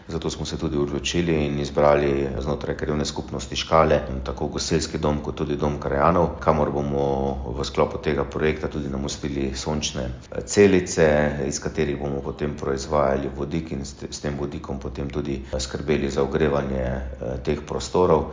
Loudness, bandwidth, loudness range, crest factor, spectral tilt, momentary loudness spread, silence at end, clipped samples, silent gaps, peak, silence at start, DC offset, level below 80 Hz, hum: -24 LUFS; 7.8 kHz; 5 LU; 20 dB; -5.5 dB/octave; 10 LU; 0 s; under 0.1%; none; -2 dBFS; 0 s; under 0.1%; -36 dBFS; none